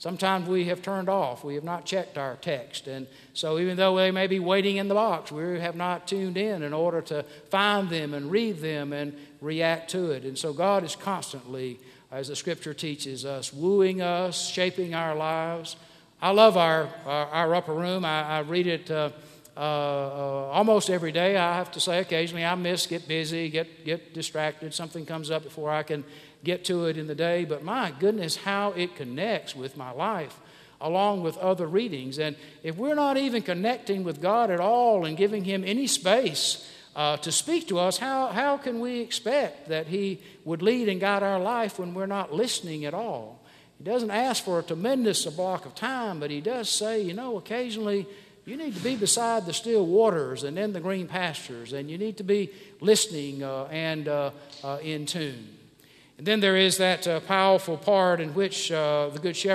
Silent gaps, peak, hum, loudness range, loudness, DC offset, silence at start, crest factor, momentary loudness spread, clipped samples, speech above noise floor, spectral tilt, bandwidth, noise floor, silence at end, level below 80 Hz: none; -4 dBFS; none; 5 LU; -27 LUFS; under 0.1%; 0 s; 24 dB; 12 LU; under 0.1%; 29 dB; -4 dB/octave; 15 kHz; -56 dBFS; 0 s; -74 dBFS